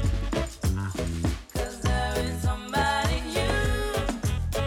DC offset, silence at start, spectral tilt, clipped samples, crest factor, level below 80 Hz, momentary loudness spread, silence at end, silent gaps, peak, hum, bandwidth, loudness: under 0.1%; 0 s; -5 dB/octave; under 0.1%; 14 dB; -32 dBFS; 5 LU; 0 s; none; -12 dBFS; none; 17.5 kHz; -28 LUFS